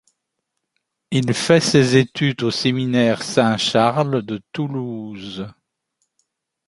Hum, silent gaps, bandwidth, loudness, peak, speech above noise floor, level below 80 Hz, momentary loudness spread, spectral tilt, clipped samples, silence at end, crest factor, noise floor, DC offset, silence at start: none; none; 11.5 kHz; -18 LUFS; 0 dBFS; 59 dB; -58 dBFS; 16 LU; -5 dB/octave; under 0.1%; 1.15 s; 20 dB; -77 dBFS; under 0.1%; 1.1 s